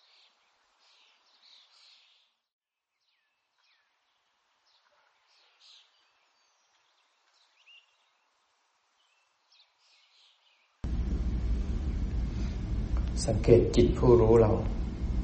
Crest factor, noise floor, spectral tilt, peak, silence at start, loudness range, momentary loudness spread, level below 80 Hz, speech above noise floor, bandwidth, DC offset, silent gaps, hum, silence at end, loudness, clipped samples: 26 dB; -82 dBFS; -7.5 dB/octave; -6 dBFS; 10.85 s; 15 LU; 14 LU; -38 dBFS; 60 dB; 8.4 kHz; under 0.1%; none; none; 0 s; -27 LUFS; under 0.1%